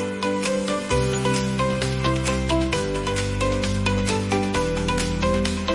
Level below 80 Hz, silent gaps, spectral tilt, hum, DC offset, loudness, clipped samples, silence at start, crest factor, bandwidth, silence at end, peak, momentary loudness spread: -34 dBFS; none; -5 dB/octave; none; under 0.1%; -23 LUFS; under 0.1%; 0 s; 14 dB; 11.5 kHz; 0 s; -8 dBFS; 2 LU